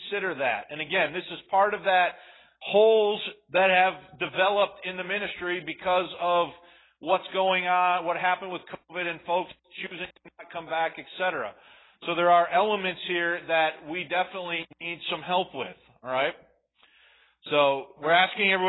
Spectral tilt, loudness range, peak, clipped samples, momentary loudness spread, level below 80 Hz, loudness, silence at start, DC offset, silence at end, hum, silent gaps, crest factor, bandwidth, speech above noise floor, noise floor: -8 dB/octave; 7 LU; -8 dBFS; under 0.1%; 16 LU; -70 dBFS; -26 LUFS; 0 s; under 0.1%; 0 s; none; none; 20 dB; 4.1 kHz; 37 dB; -63 dBFS